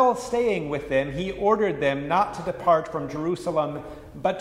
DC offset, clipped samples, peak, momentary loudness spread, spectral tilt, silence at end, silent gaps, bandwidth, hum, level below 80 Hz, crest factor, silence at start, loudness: under 0.1%; under 0.1%; -8 dBFS; 7 LU; -6 dB/octave; 0 s; none; 14.5 kHz; none; -50 dBFS; 16 dB; 0 s; -25 LUFS